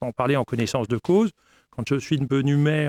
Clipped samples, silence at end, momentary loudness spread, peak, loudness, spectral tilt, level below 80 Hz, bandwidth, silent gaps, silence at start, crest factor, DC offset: under 0.1%; 0 s; 6 LU; -8 dBFS; -23 LUFS; -7 dB/octave; -56 dBFS; 13.5 kHz; none; 0 s; 16 dB; under 0.1%